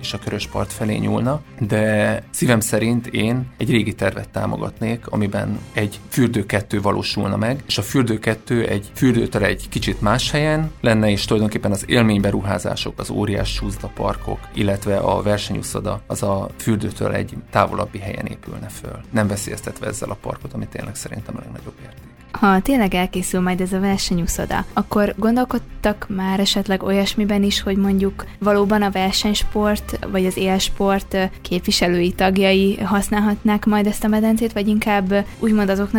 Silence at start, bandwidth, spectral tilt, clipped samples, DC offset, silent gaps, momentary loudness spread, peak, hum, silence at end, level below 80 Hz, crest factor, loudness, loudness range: 0 s; 18 kHz; -5 dB/octave; under 0.1%; under 0.1%; none; 10 LU; 0 dBFS; none; 0 s; -36 dBFS; 18 dB; -20 LUFS; 5 LU